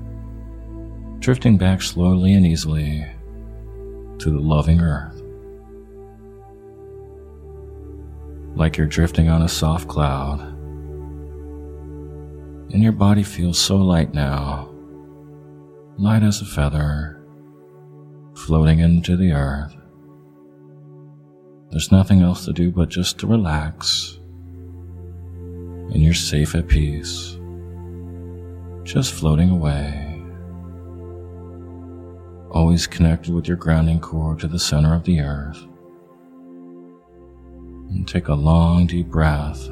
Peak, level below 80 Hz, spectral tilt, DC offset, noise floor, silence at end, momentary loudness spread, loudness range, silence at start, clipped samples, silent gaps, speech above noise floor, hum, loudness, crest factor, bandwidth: 0 dBFS; -30 dBFS; -6 dB/octave; under 0.1%; -47 dBFS; 0 s; 22 LU; 6 LU; 0 s; under 0.1%; none; 30 dB; none; -19 LUFS; 20 dB; 15 kHz